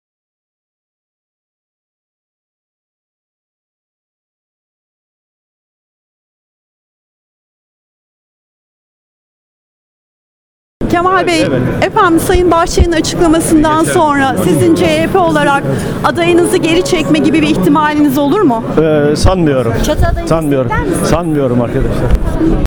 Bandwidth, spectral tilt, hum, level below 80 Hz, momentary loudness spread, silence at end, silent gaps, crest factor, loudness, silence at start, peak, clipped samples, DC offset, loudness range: 20 kHz; -5.5 dB/octave; none; -24 dBFS; 4 LU; 0 s; none; 12 dB; -11 LUFS; 10.8 s; 0 dBFS; under 0.1%; under 0.1%; 5 LU